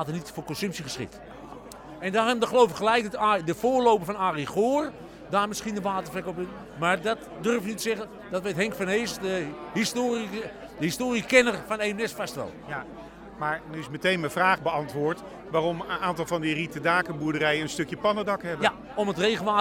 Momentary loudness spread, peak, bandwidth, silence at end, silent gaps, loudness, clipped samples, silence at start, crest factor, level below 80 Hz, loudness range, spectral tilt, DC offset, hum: 13 LU; -6 dBFS; 18 kHz; 0 s; none; -27 LUFS; under 0.1%; 0 s; 22 dB; -58 dBFS; 4 LU; -4.5 dB/octave; under 0.1%; none